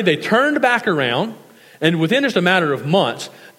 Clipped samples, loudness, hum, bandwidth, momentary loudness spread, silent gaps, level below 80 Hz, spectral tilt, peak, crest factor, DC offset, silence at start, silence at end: under 0.1%; -17 LUFS; none; 16.5 kHz; 7 LU; none; -72 dBFS; -5.5 dB/octave; 0 dBFS; 18 dB; under 0.1%; 0 s; 0.1 s